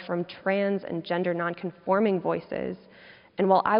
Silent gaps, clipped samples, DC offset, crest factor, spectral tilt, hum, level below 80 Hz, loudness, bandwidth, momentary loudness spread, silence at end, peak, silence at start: none; under 0.1%; under 0.1%; 18 dB; -5 dB/octave; none; -66 dBFS; -28 LUFS; 5.4 kHz; 11 LU; 0 s; -8 dBFS; 0 s